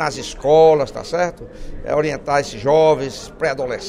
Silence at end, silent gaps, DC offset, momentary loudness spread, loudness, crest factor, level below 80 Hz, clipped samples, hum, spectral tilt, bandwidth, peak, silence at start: 0 s; none; under 0.1%; 14 LU; -17 LUFS; 16 dB; -38 dBFS; under 0.1%; none; -5 dB/octave; 11.5 kHz; -2 dBFS; 0 s